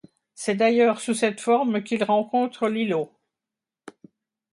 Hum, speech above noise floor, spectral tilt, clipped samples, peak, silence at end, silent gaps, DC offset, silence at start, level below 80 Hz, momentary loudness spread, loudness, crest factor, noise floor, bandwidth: none; 66 dB; -4.5 dB/octave; under 0.1%; -8 dBFS; 0.65 s; none; under 0.1%; 0.4 s; -74 dBFS; 8 LU; -23 LUFS; 16 dB; -88 dBFS; 11.5 kHz